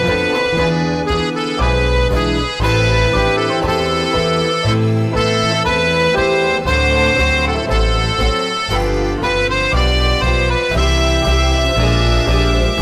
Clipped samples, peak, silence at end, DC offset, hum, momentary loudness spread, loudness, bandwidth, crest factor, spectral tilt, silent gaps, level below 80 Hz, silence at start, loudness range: under 0.1%; -4 dBFS; 0 s; under 0.1%; none; 3 LU; -15 LUFS; 13.5 kHz; 10 dB; -5 dB/octave; none; -20 dBFS; 0 s; 1 LU